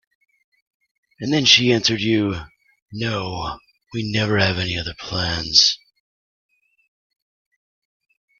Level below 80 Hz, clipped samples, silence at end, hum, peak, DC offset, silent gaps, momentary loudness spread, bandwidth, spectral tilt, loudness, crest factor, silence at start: -48 dBFS; under 0.1%; 2.65 s; none; 0 dBFS; under 0.1%; 2.82-2.86 s; 18 LU; 12 kHz; -3.5 dB/octave; -18 LUFS; 22 dB; 1.2 s